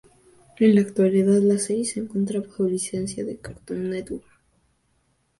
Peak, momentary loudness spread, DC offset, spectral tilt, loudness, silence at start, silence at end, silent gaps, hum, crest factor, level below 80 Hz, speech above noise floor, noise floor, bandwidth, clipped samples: -6 dBFS; 15 LU; under 0.1%; -6 dB/octave; -23 LUFS; 0.6 s; 1.2 s; none; none; 18 dB; -58 dBFS; 46 dB; -68 dBFS; 11.5 kHz; under 0.1%